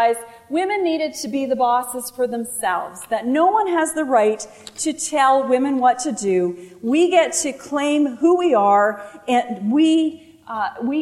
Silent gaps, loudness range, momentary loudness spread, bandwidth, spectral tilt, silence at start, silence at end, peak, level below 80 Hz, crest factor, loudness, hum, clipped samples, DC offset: none; 3 LU; 10 LU; 15.5 kHz; -3.5 dB/octave; 0 s; 0 s; -4 dBFS; -64 dBFS; 16 dB; -19 LUFS; none; under 0.1%; under 0.1%